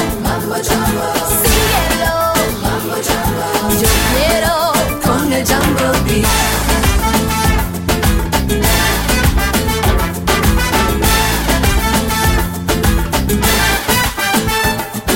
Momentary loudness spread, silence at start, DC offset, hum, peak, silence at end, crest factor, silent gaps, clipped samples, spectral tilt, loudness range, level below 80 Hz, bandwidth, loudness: 4 LU; 0 s; under 0.1%; none; 0 dBFS; 0 s; 14 dB; none; under 0.1%; -4 dB/octave; 1 LU; -20 dBFS; 17 kHz; -14 LUFS